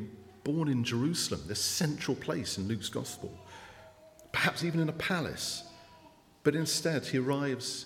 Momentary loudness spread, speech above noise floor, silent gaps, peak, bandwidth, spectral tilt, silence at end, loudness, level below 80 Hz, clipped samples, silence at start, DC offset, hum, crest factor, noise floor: 15 LU; 27 dB; none; -12 dBFS; 17 kHz; -4 dB/octave; 0 s; -32 LUFS; -64 dBFS; under 0.1%; 0 s; under 0.1%; none; 22 dB; -59 dBFS